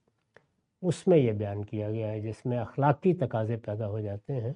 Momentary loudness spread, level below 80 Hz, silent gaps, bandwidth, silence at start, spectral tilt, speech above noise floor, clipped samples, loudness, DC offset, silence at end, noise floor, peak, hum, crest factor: 10 LU; -66 dBFS; none; 11 kHz; 0.8 s; -8.5 dB/octave; 36 dB; under 0.1%; -29 LUFS; under 0.1%; 0 s; -65 dBFS; -10 dBFS; none; 20 dB